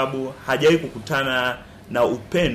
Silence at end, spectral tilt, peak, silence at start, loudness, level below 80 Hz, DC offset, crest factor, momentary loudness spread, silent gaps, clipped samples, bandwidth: 0 s; -5 dB/octave; -8 dBFS; 0 s; -21 LUFS; -46 dBFS; under 0.1%; 12 dB; 10 LU; none; under 0.1%; 15.5 kHz